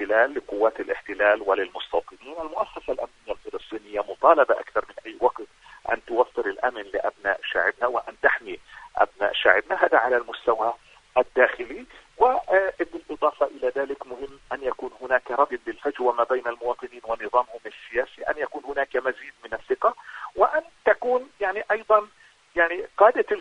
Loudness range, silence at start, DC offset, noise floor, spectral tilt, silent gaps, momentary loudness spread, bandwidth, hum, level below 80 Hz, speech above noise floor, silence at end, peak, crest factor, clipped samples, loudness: 4 LU; 0 s; under 0.1%; -55 dBFS; -4 dB/octave; none; 15 LU; 9.8 kHz; none; -58 dBFS; 32 dB; 0 s; 0 dBFS; 24 dB; under 0.1%; -24 LUFS